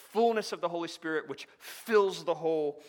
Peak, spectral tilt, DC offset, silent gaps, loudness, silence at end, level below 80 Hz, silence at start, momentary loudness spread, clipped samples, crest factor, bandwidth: -12 dBFS; -4 dB/octave; under 0.1%; none; -31 LUFS; 0 s; -88 dBFS; 0 s; 16 LU; under 0.1%; 18 dB; 18.5 kHz